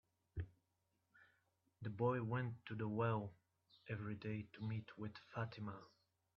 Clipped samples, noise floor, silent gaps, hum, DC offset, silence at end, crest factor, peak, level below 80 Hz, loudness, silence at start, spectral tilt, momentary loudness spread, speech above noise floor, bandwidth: under 0.1%; -86 dBFS; none; none; under 0.1%; 0.5 s; 20 dB; -26 dBFS; -70 dBFS; -46 LUFS; 0.35 s; -7 dB/octave; 13 LU; 41 dB; 5.8 kHz